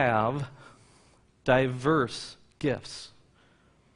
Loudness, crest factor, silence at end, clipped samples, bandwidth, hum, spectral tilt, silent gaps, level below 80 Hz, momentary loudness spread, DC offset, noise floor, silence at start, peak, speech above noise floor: -28 LUFS; 22 dB; 0.9 s; under 0.1%; 10.5 kHz; none; -6 dB/octave; none; -58 dBFS; 18 LU; under 0.1%; -62 dBFS; 0 s; -8 dBFS; 35 dB